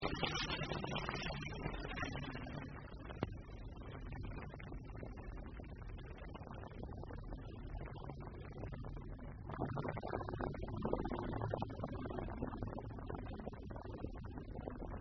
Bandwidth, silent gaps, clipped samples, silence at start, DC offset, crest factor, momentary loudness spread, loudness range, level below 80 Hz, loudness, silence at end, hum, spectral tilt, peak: 6.2 kHz; none; under 0.1%; 0 s; under 0.1%; 24 dB; 10 LU; 7 LU; -52 dBFS; -46 LUFS; 0 s; none; -4.5 dB/octave; -20 dBFS